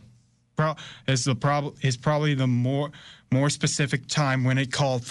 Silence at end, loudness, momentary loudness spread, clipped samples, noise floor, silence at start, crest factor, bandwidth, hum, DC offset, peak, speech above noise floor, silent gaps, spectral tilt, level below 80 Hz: 0 s; -25 LUFS; 5 LU; under 0.1%; -59 dBFS; 0.6 s; 12 dB; 11.5 kHz; none; under 0.1%; -12 dBFS; 34 dB; none; -5 dB/octave; -58 dBFS